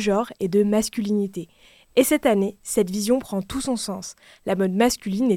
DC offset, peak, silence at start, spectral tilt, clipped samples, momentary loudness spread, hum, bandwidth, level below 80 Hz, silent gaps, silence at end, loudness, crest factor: under 0.1%; -4 dBFS; 0 s; -5 dB/octave; under 0.1%; 11 LU; none; 17.5 kHz; -52 dBFS; none; 0 s; -23 LUFS; 18 dB